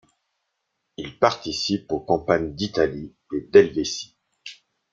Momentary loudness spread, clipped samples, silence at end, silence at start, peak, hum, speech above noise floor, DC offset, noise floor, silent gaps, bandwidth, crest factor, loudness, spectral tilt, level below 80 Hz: 24 LU; under 0.1%; 0.4 s; 1 s; -2 dBFS; none; 55 dB; under 0.1%; -77 dBFS; none; 7.6 kHz; 22 dB; -22 LUFS; -4.5 dB/octave; -54 dBFS